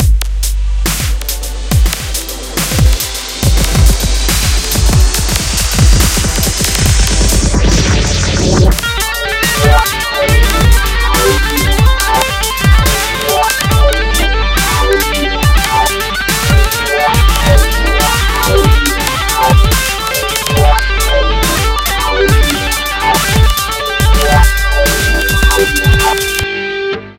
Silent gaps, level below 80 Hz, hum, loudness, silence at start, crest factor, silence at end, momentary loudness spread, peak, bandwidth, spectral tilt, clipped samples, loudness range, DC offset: none; -14 dBFS; none; -11 LUFS; 0 s; 10 dB; 0.05 s; 5 LU; 0 dBFS; 17 kHz; -3.5 dB/octave; 0.2%; 1 LU; under 0.1%